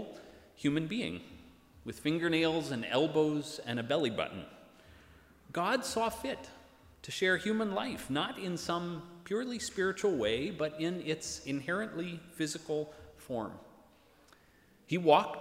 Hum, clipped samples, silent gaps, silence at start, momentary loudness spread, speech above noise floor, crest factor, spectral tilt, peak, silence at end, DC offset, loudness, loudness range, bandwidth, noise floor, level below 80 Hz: none; under 0.1%; none; 0 s; 15 LU; 31 dB; 24 dB; -4.5 dB/octave; -10 dBFS; 0 s; under 0.1%; -34 LUFS; 5 LU; 16 kHz; -64 dBFS; -66 dBFS